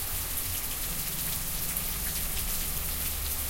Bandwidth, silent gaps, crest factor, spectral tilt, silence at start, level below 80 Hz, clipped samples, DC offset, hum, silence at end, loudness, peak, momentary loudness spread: 17 kHz; none; 20 dB; -1.5 dB/octave; 0 s; -38 dBFS; under 0.1%; under 0.1%; none; 0 s; -30 LUFS; -12 dBFS; 1 LU